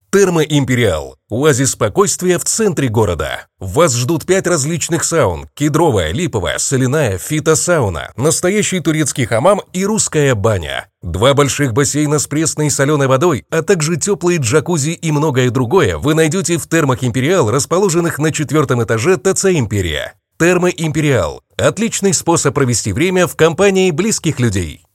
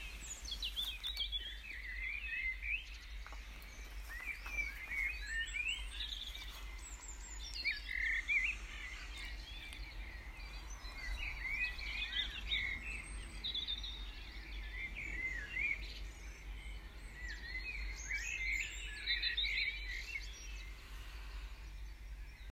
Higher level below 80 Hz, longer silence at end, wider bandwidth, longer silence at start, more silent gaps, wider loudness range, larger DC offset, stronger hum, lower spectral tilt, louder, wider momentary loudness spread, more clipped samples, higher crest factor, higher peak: first, -40 dBFS vs -48 dBFS; first, 0.2 s vs 0 s; about the same, 16.5 kHz vs 16 kHz; first, 0.15 s vs 0 s; neither; second, 1 LU vs 4 LU; neither; neither; first, -4.5 dB/octave vs -1.5 dB/octave; first, -14 LUFS vs -41 LUFS; second, 5 LU vs 15 LU; neither; about the same, 14 dB vs 18 dB; first, 0 dBFS vs -24 dBFS